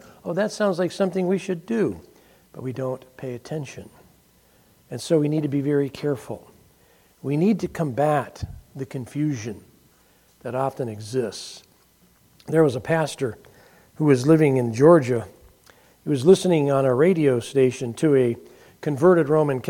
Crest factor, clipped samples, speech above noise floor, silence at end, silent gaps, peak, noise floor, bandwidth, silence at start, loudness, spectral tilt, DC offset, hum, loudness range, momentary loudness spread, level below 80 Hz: 22 dB; under 0.1%; 37 dB; 0 s; none; -2 dBFS; -58 dBFS; 16.5 kHz; 0.25 s; -22 LUFS; -7 dB/octave; under 0.1%; none; 11 LU; 18 LU; -56 dBFS